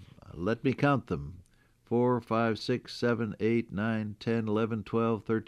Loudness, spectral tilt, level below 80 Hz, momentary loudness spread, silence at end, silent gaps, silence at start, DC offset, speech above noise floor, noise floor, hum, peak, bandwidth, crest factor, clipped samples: -30 LUFS; -7.5 dB/octave; -60 dBFS; 6 LU; 0.05 s; none; 0 s; under 0.1%; 34 dB; -63 dBFS; none; -14 dBFS; 11 kHz; 16 dB; under 0.1%